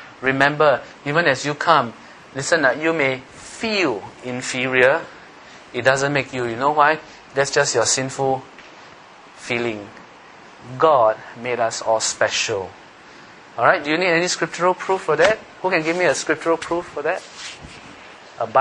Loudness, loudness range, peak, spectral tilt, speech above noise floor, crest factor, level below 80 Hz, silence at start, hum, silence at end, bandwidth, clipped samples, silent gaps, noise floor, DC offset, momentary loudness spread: -19 LUFS; 4 LU; 0 dBFS; -3 dB/octave; 24 dB; 20 dB; -58 dBFS; 0 s; none; 0 s; 10.5 kHz; under 0.1%; none; -44 dBFS; under 0.1%; 17 LU